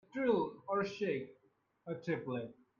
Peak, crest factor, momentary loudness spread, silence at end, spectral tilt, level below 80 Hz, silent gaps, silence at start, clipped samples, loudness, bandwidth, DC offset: -20 dBFS; 18 dB; 13 LU; 0.3 s; -7 dB/octave; -76 dBFS; none; 0.15 s; under 0.1%; -38 LUFS; 7.2 kHz; under 0.1%